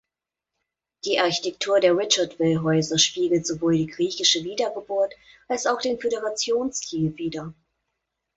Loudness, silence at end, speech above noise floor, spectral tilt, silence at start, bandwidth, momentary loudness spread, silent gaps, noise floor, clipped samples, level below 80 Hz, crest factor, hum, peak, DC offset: -23 LUFS; 0.85 s; 63 dB; -3.5 dB/octave; 1.05 s; 8.2 kHz; 8 LU; none; -87 dBFS; under 0.1%; -62 dBFS; 20 dB; none; -6 dBFS; under 0.1%